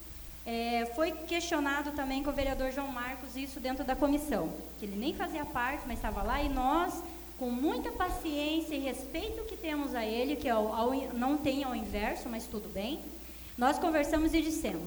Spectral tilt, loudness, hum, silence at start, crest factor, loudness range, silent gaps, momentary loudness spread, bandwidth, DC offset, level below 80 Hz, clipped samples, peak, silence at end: -4.5 dB/octave; -33 LUFS; none; 0 s; 18 dB; 2 LU; none; 9 LU; over 20 kHz; under 0.1%; -46 dBFS; under 0.1%; -14 dBFS; 0 s